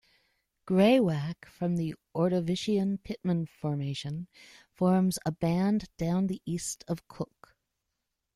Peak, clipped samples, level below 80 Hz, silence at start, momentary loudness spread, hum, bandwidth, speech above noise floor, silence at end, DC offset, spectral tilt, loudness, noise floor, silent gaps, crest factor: -10 dBFS; under 0.1%; -60 dBFS; 0.65 s; 13 LU; none; 13 kHz; 55 dB; 1.1 s; under 0.1%; -6.5 dB/octave; -30 LUFS; -84 dBFS; none; 20 dB